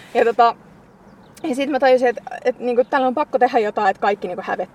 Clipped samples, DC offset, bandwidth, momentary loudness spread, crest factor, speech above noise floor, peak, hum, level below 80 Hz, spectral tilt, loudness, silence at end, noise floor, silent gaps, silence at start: under 0.1%; under 0.1%; 12 kHz; 10 LU; 16 dB; 28 dB; -2 dBFS; none; -62 dBFS; -5 dB/octave; -19 LUFS; 0.1 s; -46 dBFS; none; 0 s